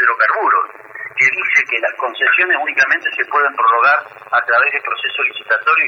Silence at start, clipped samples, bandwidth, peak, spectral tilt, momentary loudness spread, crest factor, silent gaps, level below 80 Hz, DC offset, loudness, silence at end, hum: 0 s; under 0.1%; 7.2 kHz; -2 dBFS; -1.5 dB/octave; 6 LU; 14 dB; none; -76 dBFS; under 0.1%; -14 LUFS; 0 s; none